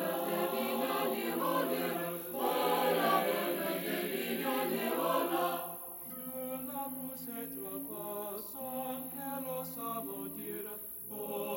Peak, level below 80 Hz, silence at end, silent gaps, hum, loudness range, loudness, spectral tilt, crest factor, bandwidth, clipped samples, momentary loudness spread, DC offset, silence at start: -16 dBFS; -74 dBFS; 0 s; none; none; 7 LU; -35 LUFS; -3.5 dB/octave; 20 dB; 16.5 kHz; under 0.1%; 10 LU; under 0.1%; 0 s